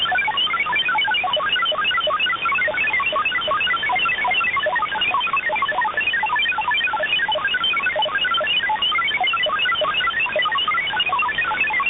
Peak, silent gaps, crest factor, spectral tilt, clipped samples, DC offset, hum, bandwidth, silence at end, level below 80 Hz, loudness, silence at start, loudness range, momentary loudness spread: -10 dBFS; none; 10 dB; -5.5 dB/octave; under 0.1%; under 0.1%; none; 4 kHz; 0 s; -54 dBFS; -18 LUFS; 0 s; 1 LU; 2 LU